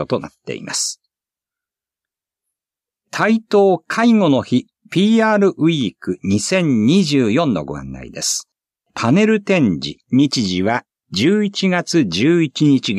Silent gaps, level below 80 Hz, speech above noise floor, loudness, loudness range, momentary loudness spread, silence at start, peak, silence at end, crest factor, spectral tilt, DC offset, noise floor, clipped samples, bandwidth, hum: none; -54 dBFS; 73 dB; -16 LUFS; 5 LU; 10 LU; 0 s; -2 dBFS; 0 s; 14 dB; -5 dB/octave; under 0.1%; -88 dBFS; under 0.1%; 14 kHz; none